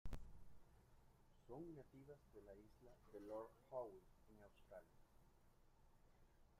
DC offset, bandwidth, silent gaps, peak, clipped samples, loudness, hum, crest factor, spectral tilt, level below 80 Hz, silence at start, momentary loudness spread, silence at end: under 0.1%; 15 kHz; none; -38 dBFS; under 0.1%; -60 LUFS; none; 20 dB; -7.5 dB/octave; -66 dBFS; 0.05 s; 15 LU; 0 s